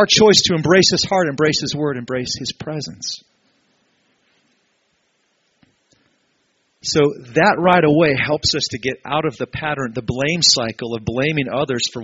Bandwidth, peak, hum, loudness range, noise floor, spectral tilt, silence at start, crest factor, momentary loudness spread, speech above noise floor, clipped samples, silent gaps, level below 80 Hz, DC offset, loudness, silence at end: 8 kHz; 0 dBFS; none; 13 LU; -65 dBFS; -3 dB/octave; 0 s; 18 dB; 13 LU; 48 dB; under 0.1%; none; -50 dBFS; under 0.1%; -17 LUFS; 0 s